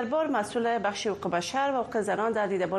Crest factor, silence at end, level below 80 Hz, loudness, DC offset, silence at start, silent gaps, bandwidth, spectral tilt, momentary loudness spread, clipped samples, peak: 14 dB; 0 s; -64 dBFS; -28 LUFS; under 0.1%; 0 s; none; 12.5 kHz; -4.5 dB/octave; 2 LU; under 0.1%; -14 dBFS